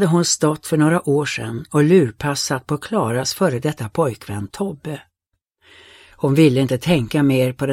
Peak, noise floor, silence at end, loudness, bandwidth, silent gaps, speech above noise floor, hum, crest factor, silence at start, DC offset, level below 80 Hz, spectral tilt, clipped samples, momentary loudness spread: -2 dBFS; -76 dBFS; 0 s; -18 LUFS; 16.5 kHz; none; 58 dB; none; 16 dB; 0 s; under 0.1%; -50 dBFS; -5.5 dB/octave; under 0.1%; 12 LU